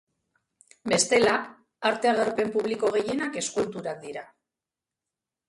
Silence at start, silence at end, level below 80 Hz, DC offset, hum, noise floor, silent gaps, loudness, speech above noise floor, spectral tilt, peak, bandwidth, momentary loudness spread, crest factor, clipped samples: 0.85 s; 1.25 s; -66 dBFS; under 0.1%; none; -89 dBFS; none; -25 LUFS; 64 dB; -3 dB/octave; -6 dBFS; 11.5 kHz; 16 LU; 20 dB; under 0.1%